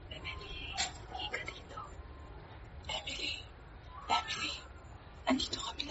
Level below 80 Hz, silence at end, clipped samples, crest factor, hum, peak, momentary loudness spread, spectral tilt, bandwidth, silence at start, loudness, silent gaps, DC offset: -52 dBFS; 0 s; under 0.1%; 24 dB; none; -18 dBFS; 18 LU; -1.5 dB/octave; 8 kHz; 0 s; -38 LUFS; none; under 0.1%